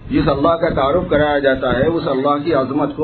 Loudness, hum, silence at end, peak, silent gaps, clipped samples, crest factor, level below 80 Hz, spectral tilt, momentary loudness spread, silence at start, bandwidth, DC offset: -16 LUFS; none; 0 s; -2 dBFS; none; under 0.1%; 14 dB; -36 dBFS; -10.5 dB/octave; 2 LU; 0 s; 4.5 kHz; under 0.1%